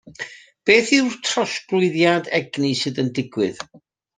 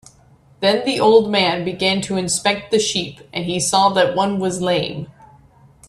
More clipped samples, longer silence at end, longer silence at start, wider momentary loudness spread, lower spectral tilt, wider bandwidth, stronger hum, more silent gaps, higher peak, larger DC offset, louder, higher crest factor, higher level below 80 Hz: neither; second, 0.55 s vs 0.8 s; second, 0.05 s vs 0.6 s; first, 18 LU vs 11 LU; about the same, -4 dB/octave vs -3.5 dB/octave; second, 9.6 kHz vs 13 kHz; neither; neither; about the same, -2 dBFS vs 0 dBFS; neither; about the same, -19 LUFS vs -18 LUFS; about the same, 20 dB vs 18 dB; second, -64 dBFS vs -54 dBFS